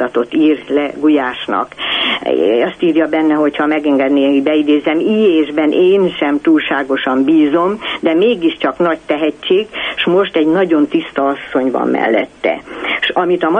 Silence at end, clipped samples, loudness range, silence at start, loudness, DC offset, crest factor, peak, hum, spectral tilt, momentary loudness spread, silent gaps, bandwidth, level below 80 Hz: 0 s; under 0.1%; 2 LU; 0 s; -14 LUFS; under 0.1%; 12 dB; -2 dBFS; none; -6.5 dB/octave; 5 LU; none; 5.2 kHz; -52 dBFS